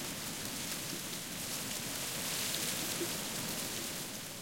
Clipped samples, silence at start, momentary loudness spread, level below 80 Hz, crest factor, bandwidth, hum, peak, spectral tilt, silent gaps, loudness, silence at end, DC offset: under 0.1%; 0 s; 5 LU; -66 dBFS; 20 dB; 17 kHz; none; -18 dBFS; -1.5 dB/octave; none; -37 LUFS; 0 s; under 0.1%